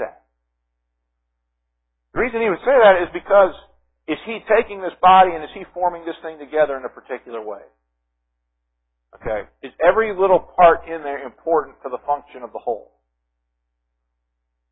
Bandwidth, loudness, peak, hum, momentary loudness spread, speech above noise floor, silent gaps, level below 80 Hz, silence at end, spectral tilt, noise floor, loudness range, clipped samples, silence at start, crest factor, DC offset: 4 kHz; -18 LUFS; 0 dBFS; 60 Hz at -55 dBFS; 18 LU; 57 dB; none; -50 dBFS; 1.9 s; -9.5 dB/octave; -75 dBFS; 11 LU; under 0.1%; 0 s; 20 dB; under 0.1%